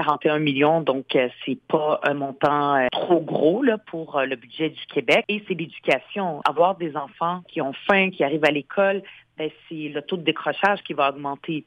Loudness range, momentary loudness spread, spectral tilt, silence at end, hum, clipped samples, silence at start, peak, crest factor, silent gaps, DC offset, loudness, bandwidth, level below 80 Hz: 2 LU; 10 LU; -6.5 dB/octave; 0.05 s; none; under 0.1%; 0 s; -6 dBFS; 18 dB; none; under 0.1%; -23 LUFS; 10.5 kHz; -68 dBFS